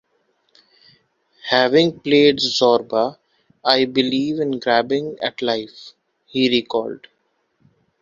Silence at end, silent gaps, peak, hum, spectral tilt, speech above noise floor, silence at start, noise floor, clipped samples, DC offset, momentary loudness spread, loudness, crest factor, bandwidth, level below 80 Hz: 1.05 s; none; 0 dBFS; none; -4.5 dB/octave; 50 dB; 1.45 s; -68 dBFS; under 0.1%; under 0.1%; 11 LU; -18 LUFS; 20 dB; 7.6 kHz; -62 dBFS